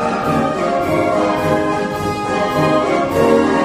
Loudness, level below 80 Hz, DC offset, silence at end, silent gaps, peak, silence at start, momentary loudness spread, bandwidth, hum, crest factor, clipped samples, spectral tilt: -16 LUFS; -42 dBFS; under 0.1%; 0 s; none; -2 dBFS; 0 s; 5 LU; 15.5 kHz; none; 14 dB; under 0.1%; -6 dB/octave